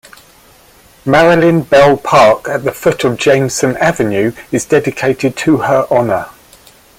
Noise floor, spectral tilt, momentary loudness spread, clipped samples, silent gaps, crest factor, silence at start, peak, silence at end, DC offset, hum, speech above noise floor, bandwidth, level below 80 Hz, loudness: -44 dBFS; -5 dB/octave; 8 LU; under 0.1%; none; 12 dB; 1.05 s; 0 dBFS; 0.7 s; under 0.1%; none; 33 dB; 16.5 kHz; -44 dBFS; -11 LUFS